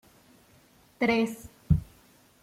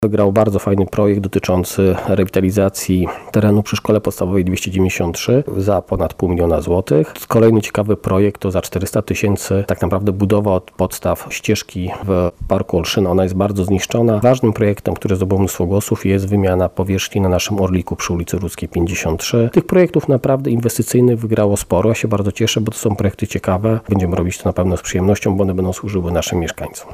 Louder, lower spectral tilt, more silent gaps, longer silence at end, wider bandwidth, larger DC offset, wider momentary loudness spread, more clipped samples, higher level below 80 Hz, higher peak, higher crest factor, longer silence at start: second, -28 LUFS vs -16 LUFS; about the same, -7 dB/octave vs -6 dB/octave; neither; first, 0.6 s vs 0 s; about the same, 16 kHz vs 16 kHz; neither; about the same, 7 LU vs 6 LU; neither; second, -44 dBFS vs -38 dBFS; second, -10 dBFS vs -2 dBFS; first, 22 dB vs 14 dB; first, 1 s vs 0 s